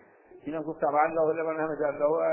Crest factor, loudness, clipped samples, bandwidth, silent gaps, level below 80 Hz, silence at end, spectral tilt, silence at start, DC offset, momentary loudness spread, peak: 18 dB; -28 LUFS; under 0.1%; 3.2 kHz; none; -68 dBFS; 0 s; -11 dB/octave; 0.35 s; under 0.1%; 11 LU; -10 dBFS